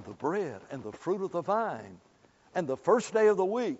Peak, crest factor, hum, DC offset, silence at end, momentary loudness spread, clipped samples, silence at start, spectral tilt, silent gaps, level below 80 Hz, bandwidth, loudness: -12 dBFS; 18 dB; none; under 0.1%; 0 s; 16 LU; under 0.1%; 0 s; -5 dB/octave; none; -72 dBFS; 8 kHz; -30 LUFS